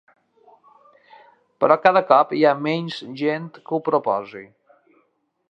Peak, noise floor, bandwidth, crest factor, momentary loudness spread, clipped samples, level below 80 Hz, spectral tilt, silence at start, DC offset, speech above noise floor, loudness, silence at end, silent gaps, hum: 0 dBFS; -67 dBFS; 8 kHz; 22 dB; 14 LU; under 0.1%; -76 dBFS; -7 dB/octave; 1.6 s; under 0.1%; 47 dB; -20 LUFS; 1.05 s; none; none